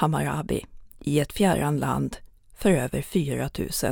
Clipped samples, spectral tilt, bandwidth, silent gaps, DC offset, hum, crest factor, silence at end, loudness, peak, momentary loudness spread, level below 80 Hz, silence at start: under 0.1%; -5.5 dB/octave; over 20 kHz; none; under 0.1%; none; 18 dB; 0 s; -26 LUFS; -8 dBFS; 9 LU; -44 dBFS; 0 s